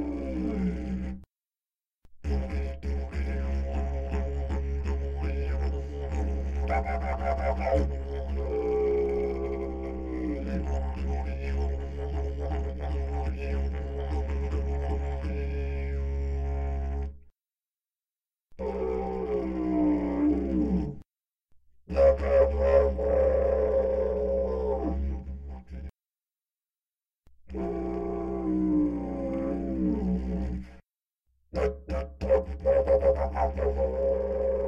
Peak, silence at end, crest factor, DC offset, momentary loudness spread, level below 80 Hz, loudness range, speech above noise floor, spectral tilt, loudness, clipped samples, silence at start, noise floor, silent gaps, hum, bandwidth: -10 dBFS; 0 s; 20 dB; under 0.1%; 10 LU; -34 dBFS; 9 LU; over 63 dB; -9.5 dB/octave; -29 LUFS; under 0.1%; 0 s; under -90 dBFS; none; none; 7 kHz